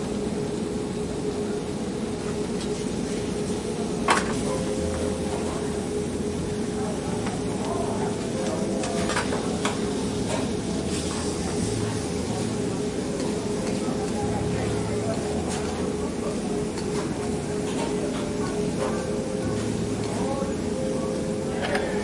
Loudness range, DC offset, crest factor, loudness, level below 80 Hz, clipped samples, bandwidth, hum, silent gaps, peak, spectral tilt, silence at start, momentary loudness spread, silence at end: 1 LU; under 0.1%; 20 dB; -27 LUFS; -44 dBFS; under 0.1%; 11.5 kHz; none; none; -6 dBFS; -5 dB/octave; 0 s; 2 LU; 0 s